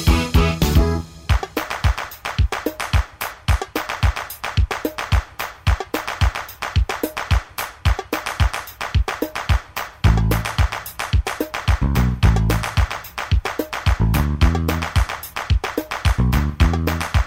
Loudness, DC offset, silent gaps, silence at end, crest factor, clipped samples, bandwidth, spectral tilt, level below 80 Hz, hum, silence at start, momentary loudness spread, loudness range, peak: -21 LUFS; under 0.1%; none; 0 s; 18 dB; under 0.1%; 16.5 kHz; -5.5 dB/octave; -22 dBFS; none; 0 s; 8 LU; 3 LU; -2 dBFS